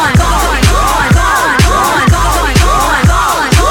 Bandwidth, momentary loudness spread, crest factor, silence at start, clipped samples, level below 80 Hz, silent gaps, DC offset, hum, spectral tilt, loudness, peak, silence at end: 19 kHz; 1 LU; 8 dB; 0 s; 0.3%; -14 dBFS; none; under 0.1%; none; -4 dB/octave; -9 LUFS; 0 dBFS; 0 s